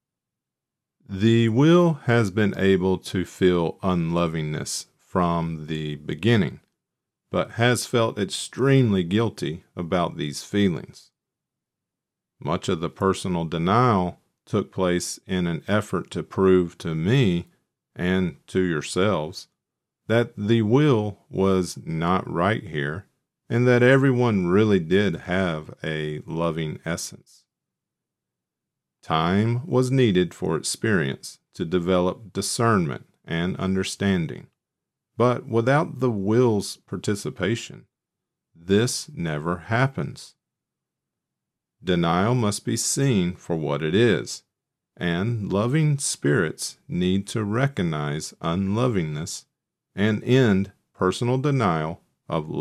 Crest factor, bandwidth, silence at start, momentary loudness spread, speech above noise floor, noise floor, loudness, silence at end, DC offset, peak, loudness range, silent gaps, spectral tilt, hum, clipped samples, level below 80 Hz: 18 dB; 14 kHz; 1.1 s; 11 LU; 64 dB; -87 dBFS; -23 LUFS; 0 s; under 0.1%; -4 dBFS; 6 LU; none; -6 dB/octave; none; under 0.1%; -56 dBFS